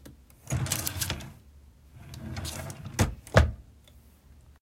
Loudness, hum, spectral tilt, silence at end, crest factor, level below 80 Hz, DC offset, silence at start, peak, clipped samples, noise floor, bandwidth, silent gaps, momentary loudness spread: -30 LUFS; none; -4.5 dB/octave; 0.1 s; 26 dB; -40 dBFS; under 0.1%; 0.05 s; -6 dBFS; under 0.1%; -55 dBFS; 16.5 kHz; none; 23 LU